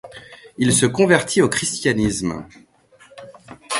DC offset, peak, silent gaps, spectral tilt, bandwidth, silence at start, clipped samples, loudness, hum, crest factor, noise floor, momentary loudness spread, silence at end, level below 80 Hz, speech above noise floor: under 0.1%; 0 dBFS; none; -4 dB/octave; 11.5 kHz; 0.05 s; under 0.1%; -18 LUFS; none; 20 dB; -51 dBFS; 22 LU; 0 s; -46 dBFS; 33 dB